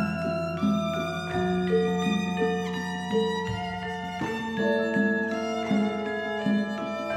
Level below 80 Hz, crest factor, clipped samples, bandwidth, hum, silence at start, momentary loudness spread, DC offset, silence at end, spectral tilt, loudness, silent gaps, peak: -56 dBFS; 14 dB; under 0.1%; 13 kHz; none; 0 s; 6 LU; under 0.1%; 0 s; -6 dB/octave; -27 LUFS; none; -14 dBFS